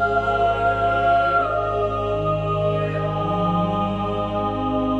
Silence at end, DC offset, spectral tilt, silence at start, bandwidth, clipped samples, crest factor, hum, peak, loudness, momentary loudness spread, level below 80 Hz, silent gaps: 0 s; under 0.1%; -8 dB/octave; 0 s; 8.4 kHz; under 0.1%; 12 dB; none; -8 dBFS; -21 LUFS; 5 LU; -38 dBFS; none